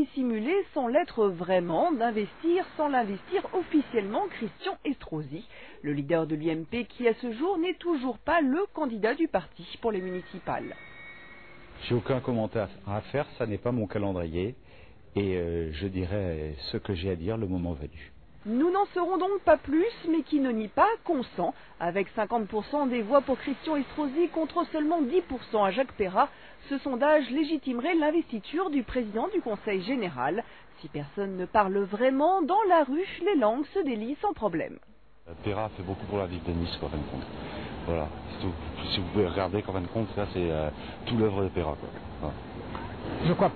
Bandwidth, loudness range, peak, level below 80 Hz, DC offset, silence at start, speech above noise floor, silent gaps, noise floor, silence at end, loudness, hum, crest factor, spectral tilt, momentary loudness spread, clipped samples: 4.6 kHz; 6 LU; -8 dBFS; -50 dBFS; 0.2%; 0 s; 25 dB; none; -53 dBFS; 0 s; -29 LUFS; none; 22 dB; -10 dB/octave; 12 LU; under 0.1%